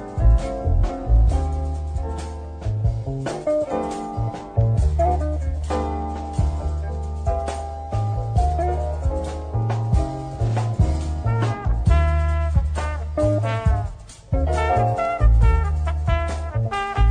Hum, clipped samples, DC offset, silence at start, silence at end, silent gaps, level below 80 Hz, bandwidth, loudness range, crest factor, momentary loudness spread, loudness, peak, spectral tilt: none; under 0.1%; under 0.1%; 0 s; 0 s; none; -24 dBFS; 9.8 kHz; 4 LU; 16 dB; 8 LU; -23 LUFS; -4 dBFS; -7.5 dB/octave